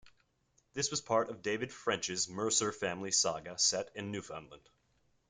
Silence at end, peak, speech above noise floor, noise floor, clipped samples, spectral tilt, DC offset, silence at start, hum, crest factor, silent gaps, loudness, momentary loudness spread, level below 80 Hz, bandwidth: 0.7 s; -16 dBFS; 39 dB; -75 dBFS; under 0.1%; -2 dB/octave; under 0.1%; 0.05 s; none; 20 dB; none; -33 LUFS; 11 LU; -72 dBFS; 11 kHz